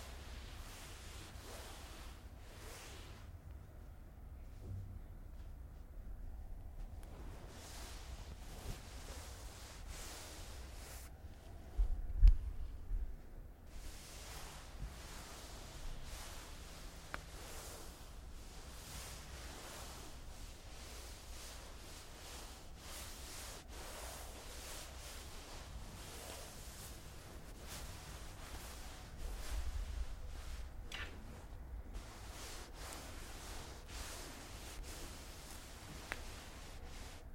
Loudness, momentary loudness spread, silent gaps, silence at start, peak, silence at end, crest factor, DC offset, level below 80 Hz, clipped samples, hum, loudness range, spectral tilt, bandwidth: -49 LUFS; 7 LU; none; 0 s; -16 dBFS; 0 s; 30 dB; under 0.1%; -46 dBFS; under 0.1%; none; 12 LU; -3.5 dB/octave; 16.5 kHz